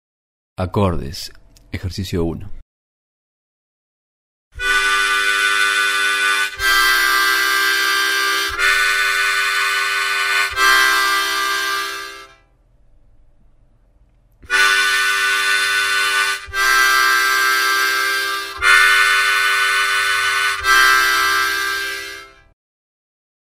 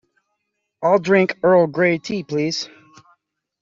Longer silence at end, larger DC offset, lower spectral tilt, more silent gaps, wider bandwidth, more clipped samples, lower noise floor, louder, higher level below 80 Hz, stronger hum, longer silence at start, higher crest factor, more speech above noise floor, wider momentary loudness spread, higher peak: first, 1.25 s vs 0.95 s; neither; second, -1 dB/octave vs -5.5 dB/octave; first, 2.62-4.51 s vs none; first, 16 kHz vs 7.6 kHz; neither; second, -53 dBFS vs -75 dBFS; first, -15 LUFS vs -18 LUFS; first, -42 dBFS vs -64 dBFS; neither; second, 0.6 s vs 0.8 s; about the same, 18 dB vs 16 dB; second, 32 dB vs 58 dB; first, 12 LU vs 9 LU; first, 0 dBFS vs -4 dBFS